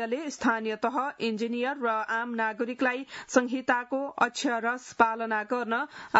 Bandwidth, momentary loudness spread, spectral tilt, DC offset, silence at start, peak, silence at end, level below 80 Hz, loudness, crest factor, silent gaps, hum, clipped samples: 8 kHz; 5 LU; -3.5 dB/octave; under 0.1%; 0 s; -6 dBFS; 0 s; -72 dBFS; -29 LUFS; 22 dB; none; none; under 0.1%